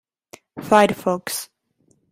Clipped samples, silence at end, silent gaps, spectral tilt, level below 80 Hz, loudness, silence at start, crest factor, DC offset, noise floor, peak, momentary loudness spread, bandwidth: under 0.1%; 0.65 s; none; -4 dB/octave; -60 dBFS; -19 LUFS; 0.55 s; 20 dB; under 0.1%; -64 dBFS; -2 dBFS; 23 LU; 16 kHz